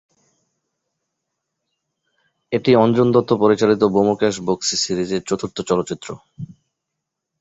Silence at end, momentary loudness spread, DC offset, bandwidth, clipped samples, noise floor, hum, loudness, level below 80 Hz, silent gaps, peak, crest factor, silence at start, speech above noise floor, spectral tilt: 0.95 s; 19 LU; under 0.1%; 8 kHz; under 0.1%; -80 dBFS; none; -18 LUFS; -56 dBFS; none; -2 dBFS; 18 dB; 2.5 s; 63 dB; -5 dB/octave